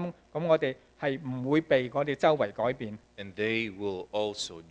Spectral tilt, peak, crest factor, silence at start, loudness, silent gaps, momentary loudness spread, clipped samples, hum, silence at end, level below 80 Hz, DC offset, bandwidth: -5.5 dB/octave; -10 dBFS; 20 dB; 0 s; -30 LUFS; none; 11 LU; under 0.1%; none; 0.1 s; -64 dBFS; under 0.1%; 10 kHz